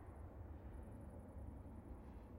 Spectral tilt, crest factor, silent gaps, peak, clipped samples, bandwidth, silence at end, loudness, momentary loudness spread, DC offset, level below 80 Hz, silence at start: -9 dB/octave; 14 dB; none; -40 dBFS; under 0.1%; 16 kHz; 0 s; -56 LUFS; 2 LU; under 0.1%; -58 dBFS; 0 s